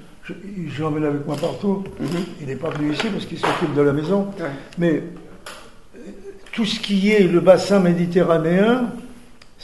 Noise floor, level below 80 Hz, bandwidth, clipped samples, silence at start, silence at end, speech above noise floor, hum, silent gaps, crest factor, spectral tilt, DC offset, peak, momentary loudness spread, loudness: -45 dBFS; -48 dBFS; 12 kHz; under 0.1%; 0 s; 0 s; 26 dB; none; none; 20 dB; -6.5 dB/octave; 0.6%; 0 dBFS; 22 LU; -20 LUFS